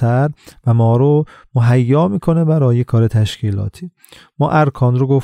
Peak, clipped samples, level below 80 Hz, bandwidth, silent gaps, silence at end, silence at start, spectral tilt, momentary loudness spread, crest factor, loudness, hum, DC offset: -2 dBFS; under 0.1%; -44 dBFS; 9.8 kHz; none; 0 s; 0 s; -8.5 dB/octave; 9 LU; 12 dB; -15 LUFS; none; under 0.1%